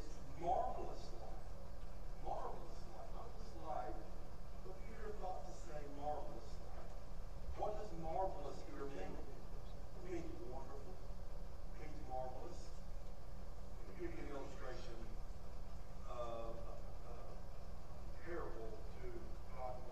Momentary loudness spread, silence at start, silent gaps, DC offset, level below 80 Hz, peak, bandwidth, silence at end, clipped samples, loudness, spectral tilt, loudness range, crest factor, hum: 10 LU; 0 s; none; 0.7%; -50 dBFS; -28 dBFS; 11.5 kHz; 0 s; under 0.1%; -51 LUFS; -6.5 dB/octave; 5 LU; 18 dB; 60 Hz at -70 dBFS